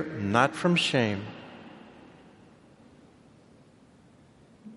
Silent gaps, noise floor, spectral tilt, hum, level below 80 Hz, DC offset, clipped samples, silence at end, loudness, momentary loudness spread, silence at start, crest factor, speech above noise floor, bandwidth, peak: none; -57 dBFS; -5 dB/octave; none; -68 dBFS; under 0.1%; under 0.1%; 0 s; -25 LUFS; 24 LU; 0 s; 26 dB; 31 dB; 11.5 kHz; -6 dBFS